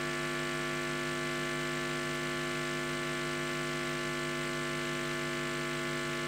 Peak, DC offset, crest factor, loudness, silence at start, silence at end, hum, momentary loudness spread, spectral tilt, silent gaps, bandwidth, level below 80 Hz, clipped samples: -22 dBFS; under 0.1%; 12 dB; -34 LUFS; 0 s; 0 s; none; 0 LU; -3.5 dB/octave; none; 16 kHz; -60 dBFS; under 0.1%